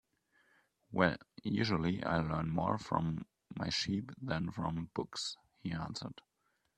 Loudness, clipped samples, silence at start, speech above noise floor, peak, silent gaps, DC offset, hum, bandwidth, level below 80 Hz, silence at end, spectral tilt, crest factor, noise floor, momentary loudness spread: -37 LUFS; under 0.1%; 0.9 s; 37 dB; -12 dBFS; none; under 0.1%; none; 10.5 kHz; -62 dBFS; 0.65 s; -5.5 dB/octave; 26 dB; -73 dBFS; 10 LU